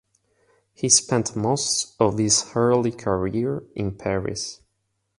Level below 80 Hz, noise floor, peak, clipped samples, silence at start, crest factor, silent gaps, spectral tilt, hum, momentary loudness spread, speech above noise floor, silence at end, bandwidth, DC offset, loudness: -50 dBFS; -74 dBFS; -2 dBFS; under 0.1%; 0.8 s; 22 dB; none; -3.5 dB/octave; none; 12 LU; 52 dB; 0.65 s; 11.5 kHz; under 0.1%; -22 LUFS